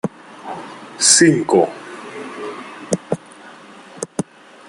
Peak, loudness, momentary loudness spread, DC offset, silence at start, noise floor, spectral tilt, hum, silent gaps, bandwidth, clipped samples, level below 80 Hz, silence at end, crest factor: 0 dBFS; -16 LUFS; 22 LU; under 0.1%; 0.05 s; -41 dBFS; -3 dB/octave; none; none; 12 kHz; under 0.1%; -60 dBFS; 0.45 s; 20 dB